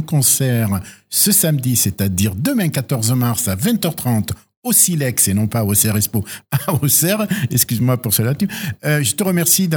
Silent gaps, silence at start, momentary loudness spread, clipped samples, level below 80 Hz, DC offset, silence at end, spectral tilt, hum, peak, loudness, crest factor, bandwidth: 4.56-4.62 s; 0 s; 8 LU; under 0.1%; -48 dBFS; under 0.1%; 0 s; -4 dB/octave; none; 0 dBFS; -16 LUFS; 16 dB; over 20 kHz